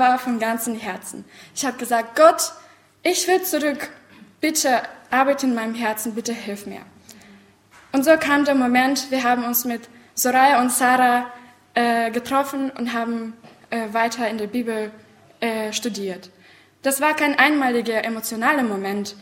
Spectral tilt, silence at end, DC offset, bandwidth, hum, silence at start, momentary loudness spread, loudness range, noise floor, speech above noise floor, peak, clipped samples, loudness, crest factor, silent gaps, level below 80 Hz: -2.5 dB/octave; 0 s; under 0.1%; 16.5 kHz; none; 0 s; 14 LU; 7 LU; -51 dBFS; 31 dB; 0 dBFS; under 0.1%; -20 LUFS; 20 dB; none; -66 dBFS